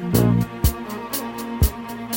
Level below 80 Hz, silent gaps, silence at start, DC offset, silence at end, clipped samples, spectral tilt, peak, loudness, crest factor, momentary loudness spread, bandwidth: -30 dBFS; none; 0 s; under 0.1%; 0 s; under 0.1%; -6 dB/octave; -4 dBFS; -23 LUFS; 18 dB; 11 LU; 17 kHz